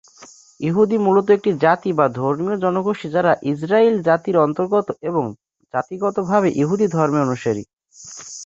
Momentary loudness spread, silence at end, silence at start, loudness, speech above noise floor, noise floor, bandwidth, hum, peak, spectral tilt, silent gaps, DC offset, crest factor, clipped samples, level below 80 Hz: 10 LU; 0 s; 0.2 s; -19 LUFS; 28 dB; -46 dBFS; 7.8 kHz; none; -2 dBFS; -7 dB/octave; 7.73-7.77 s; under 0.1%; 18 dB; under 0.1%; -60 dBFS